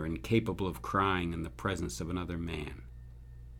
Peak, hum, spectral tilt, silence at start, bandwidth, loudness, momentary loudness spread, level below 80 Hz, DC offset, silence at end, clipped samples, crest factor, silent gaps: -14 dBFS; none; -6 dB/octave; 0 s; 17.5 kHz; -34 LUFS; 21 LU; -48 dBFS; under 0.1%; 0 s; under 0.1%; 20 dB; none